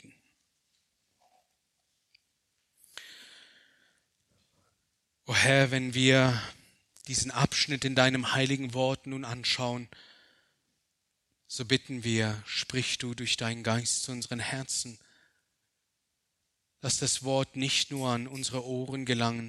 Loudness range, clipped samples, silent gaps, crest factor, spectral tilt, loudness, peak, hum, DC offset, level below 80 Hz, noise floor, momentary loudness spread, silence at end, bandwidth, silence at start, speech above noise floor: 7 LU; under 0.1%; none; 24 dB; -3.5 dB/octave; -29 LUFS; -8 dBFS; none; under 0.1%; -64 dBFS; -81 dBFS; 15 LU; 0 s; 13 kHz; 2.95 s; 51 dB